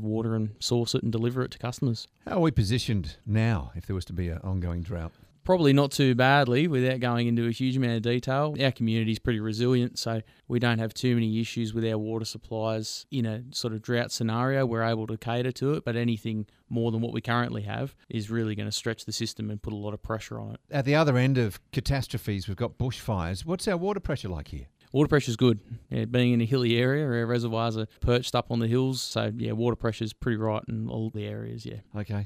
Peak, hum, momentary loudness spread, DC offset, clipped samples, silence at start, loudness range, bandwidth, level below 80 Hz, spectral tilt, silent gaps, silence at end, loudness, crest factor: -8 dBFS; none; 11 LU; under 0.1%; under 0.1%; 0 s; 6 LU; 15.5 kHz; -48 dBFS; -6 dB/octave; none; 0 s; -28 LUFS; 20 dB